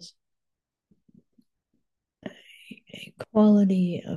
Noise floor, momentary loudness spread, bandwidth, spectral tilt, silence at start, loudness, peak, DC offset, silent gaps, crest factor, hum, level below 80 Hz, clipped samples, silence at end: -85 dBFS; 25 LU; 7.2 kHz; -8.5 dB/octave; 0 s; -21 LUFS; -10 dBFS; under 0.1%; none; 18 dB; none; -72 dBFS; under 0.1%; 0 s